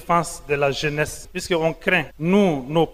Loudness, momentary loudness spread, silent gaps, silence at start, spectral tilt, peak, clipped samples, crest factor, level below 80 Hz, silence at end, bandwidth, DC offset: -21 LUFS; 7 LU; none; 0 s; -5 dB/octave; -4 dBFS; under 0.1%; 18 dB; -44 dBFS; 0 s; 16 kHz; under 0.1%